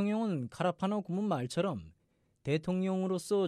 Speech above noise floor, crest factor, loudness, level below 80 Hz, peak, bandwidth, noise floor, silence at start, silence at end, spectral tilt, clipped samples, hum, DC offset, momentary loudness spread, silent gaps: 33 dB; 14 dB; -34 LUFS; -68 dBFS; -20 dBFS; 13.5 kHz; -66 dBFS; 0 s; 0 s; -7 dB/octave; under 0.1%; none; under 0.1%; 4 LU; none